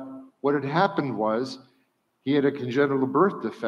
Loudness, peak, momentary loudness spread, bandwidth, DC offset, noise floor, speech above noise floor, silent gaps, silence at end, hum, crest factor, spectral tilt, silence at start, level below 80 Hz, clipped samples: -25 LUFS; -8 dBFS; 12 LU; 8.6 kHz; under 0.1%; -69 dBFS; 46 dB; none; 0 s; none; 18 dB; -7.5 dB/octave; 0 s; -76 dBFS; under 0.1%